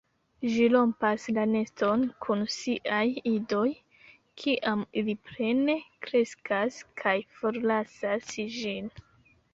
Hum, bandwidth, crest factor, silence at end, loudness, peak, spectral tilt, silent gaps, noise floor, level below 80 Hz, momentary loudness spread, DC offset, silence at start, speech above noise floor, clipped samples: none; 7.8 kHz; 18 dB; 0.55 s; -29 LUFS; -10 dBFS; -5 dB/octave; none; -58 dBFS; -68 dBFS; 8 LU; under 0.1%; 0.4 s; 30 dB; under 0.1%